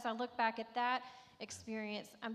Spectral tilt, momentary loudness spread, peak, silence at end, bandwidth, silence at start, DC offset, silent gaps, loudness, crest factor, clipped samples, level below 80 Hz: -3.5 dB/octave; 12 LU; -20 dBFS; 0 s; 15 kHz; 0 s; under 0.1%; none; -40 LUFS; 20 dB; under 0.1%; -84 dBFS